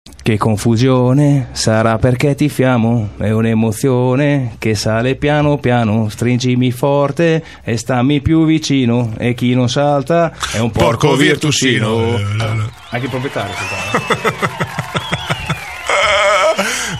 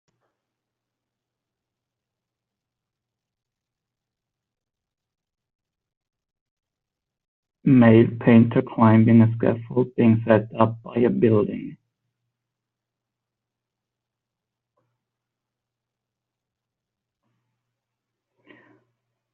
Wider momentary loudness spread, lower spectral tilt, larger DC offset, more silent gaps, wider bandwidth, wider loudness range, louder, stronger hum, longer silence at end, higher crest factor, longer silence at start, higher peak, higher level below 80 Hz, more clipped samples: about the same, 8 LU vs 10 LU; second, -5.5 dB/octave vs -8.5 dB/octave; first, 0.3% vs under 0.1%; neither; first, 14.5 kHz vs 4 kHz; second, 4 LU vs 9 LU; first, -14 LUFS vs -18 LUFS; neither; second, 0 s vs 7.6 s; second, 14 dB vs 22 dB; second, 0.05 s vs 7.65 s; about the same, 0 dBFS vs -2 dBFS; first, -38 dBFS vs -62 dBFS; neither